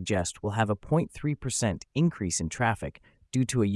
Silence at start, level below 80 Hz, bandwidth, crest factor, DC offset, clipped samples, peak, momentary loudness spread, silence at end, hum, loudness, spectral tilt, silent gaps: 0 s; -52 dBFS; 12 kHz; 18 dB; under 0.1%; under 0.1%; -12 dBFS; 6 LU; 0 s; none; -29 LUFS; -5 dB/octave; none